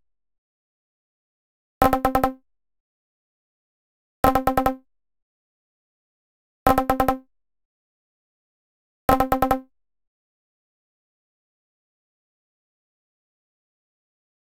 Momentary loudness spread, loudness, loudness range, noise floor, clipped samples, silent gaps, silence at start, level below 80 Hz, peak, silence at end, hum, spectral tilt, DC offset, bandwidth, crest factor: 7 LU; -22 LUFS; 3 LU; -46 dBFS; under 0.1%; 2.80-4.23 s, 5.22-6.66 s, 7.65-9.08 s; 1.8 s; -42 dBFS; -2 dBFS; 4.95 s; none; -6 dB/octave; under 0.1%; 16.5 kHz; 24 dB